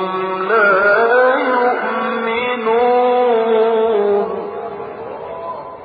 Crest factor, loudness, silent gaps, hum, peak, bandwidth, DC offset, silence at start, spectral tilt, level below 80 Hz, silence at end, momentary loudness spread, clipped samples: 14 dB; -15 LUFS; none; none; -2 dBFS; 5 kHz; under 0.1%; 0 s; -8.5 dB/octave; -62 dBFS; 0 s; 15 LU; under 0.1%